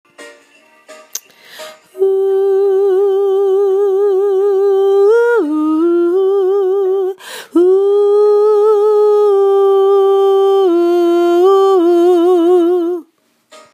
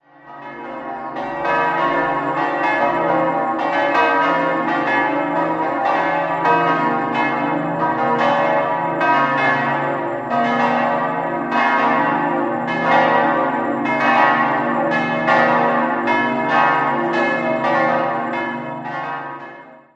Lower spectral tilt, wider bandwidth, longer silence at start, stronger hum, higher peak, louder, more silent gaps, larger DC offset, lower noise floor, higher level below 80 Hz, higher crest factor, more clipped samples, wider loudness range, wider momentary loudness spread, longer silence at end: second, -3.5 dB/octave vs -6.5 dB/octave; first, 15 kHz vs 8 kHz; about the same, 0.2 s vs 0.25 s; neither; about the same, -2 dBFS vs -2 dBFS; first, -11 LUFS vs -17 LUFS; neither; neither; first, -53 dBFS vs -39 dBFS; second, -80 dBFS vs -58 dBFS; second, 10 dB vs 16 dB; neither; about the same, 4 LU vs 2 LU; about the same, 8 LU vs 10 LU; first, 0.7 s vs 0.2 s